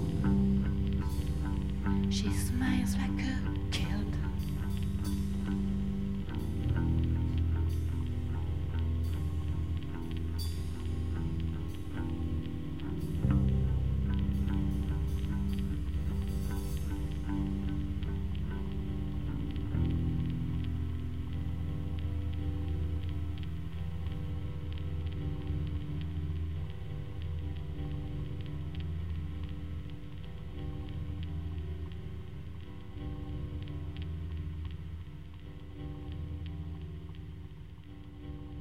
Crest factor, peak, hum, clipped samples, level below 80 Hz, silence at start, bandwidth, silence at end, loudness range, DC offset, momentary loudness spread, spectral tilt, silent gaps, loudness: 18 dB; -16 dBFS; none; under 0.1%; -38 dBFS; 0 s; 15.5 kHz; 0 s; 9 LU; 0.8%; 12 LU; -7 dB/octave; none; -36 LUFS